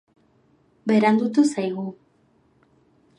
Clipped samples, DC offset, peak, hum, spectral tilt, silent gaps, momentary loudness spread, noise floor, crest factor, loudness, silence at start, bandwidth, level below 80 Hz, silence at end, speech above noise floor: under 0.1%; under 0.1%; -6 dBFS; none; -6 dB/octave; none; 14 LU; -62 dBFS; 20 dB; -21 LUFS; 0.85 s; 11 kHz; -74 dBFS; 1.25 s; 42 dB